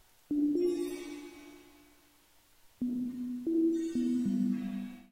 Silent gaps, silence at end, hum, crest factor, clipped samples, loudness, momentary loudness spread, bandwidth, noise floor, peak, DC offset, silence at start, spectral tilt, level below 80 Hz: none; 0.1 s; none; 14 dB; under 0.1%; -33 LUFS; 16 LU; 16 kHz; -65 dBFS; -20 dBFS; under 0.1%; 0.3 s; -7 dB/octave; -66 dBFS